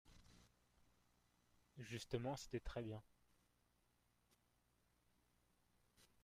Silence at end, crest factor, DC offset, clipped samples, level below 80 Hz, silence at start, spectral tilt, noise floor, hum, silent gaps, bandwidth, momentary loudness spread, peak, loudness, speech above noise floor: 0.2 s; 24 dB; under 0.1%; under 0.1%; -68 dBFS; 0.05 s; -5.5 dB/octave; -82 dBFS; 60 Hz at -75 dBFS; none; 15.5 kHz; 21 LU; -30 dBFS; -50 LUFS; 33 dB